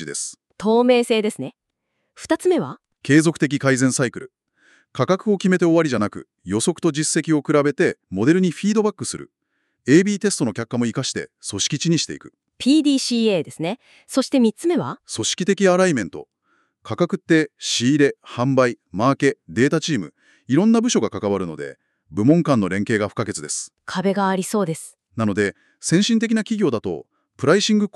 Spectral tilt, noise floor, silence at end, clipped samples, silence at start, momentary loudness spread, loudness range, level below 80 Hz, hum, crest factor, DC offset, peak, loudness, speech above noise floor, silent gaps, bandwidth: -5 dB/octave; -75 dBFS; 0.05 s; under 0.1%; 0 s; 13 LU; 2 LU; -64 dBFS; none; 18 dB; under 0.1%; -2 dBFS; -20 LUFS; 55 dB; none; 13 kHz